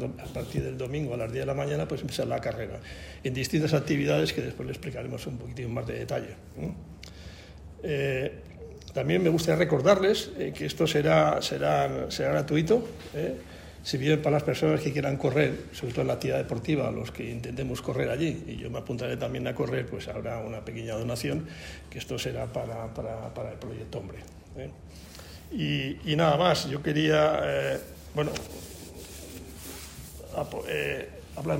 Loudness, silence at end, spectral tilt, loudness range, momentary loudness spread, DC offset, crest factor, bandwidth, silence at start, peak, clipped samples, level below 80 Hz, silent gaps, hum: -29 LUFS; 0 s; -6 dB/octave; 11 LU; 18 LU; under 0.1%; 22 dB; 16 kHz; 0 s; -8 dBFS; under 0.1%; -50 dBFS; none; none